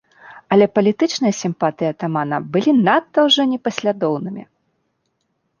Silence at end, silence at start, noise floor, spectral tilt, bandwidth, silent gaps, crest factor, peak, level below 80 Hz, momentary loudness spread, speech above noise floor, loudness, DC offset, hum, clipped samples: 1.15 s; 0.25 s; -70 dBFS; -5 dB/octave; 9.4 kHz; none; 16 dB; -2 dBFS; -64 dBFS; 8 LU; 53 dB; -17 LUFS; under 0.1%; none; under 0.1%